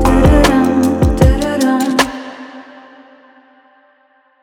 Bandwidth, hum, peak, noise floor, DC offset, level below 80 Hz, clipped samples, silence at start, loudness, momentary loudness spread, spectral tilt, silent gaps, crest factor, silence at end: 18.5 kHz; none; 0 dBFS; -54 dBFS; under 0.1%; -20 dBFS; under 0.1%; 0 s; -12 LUFS; 20 LU; -6 dB/octave; none; 14 dB; 1.8 s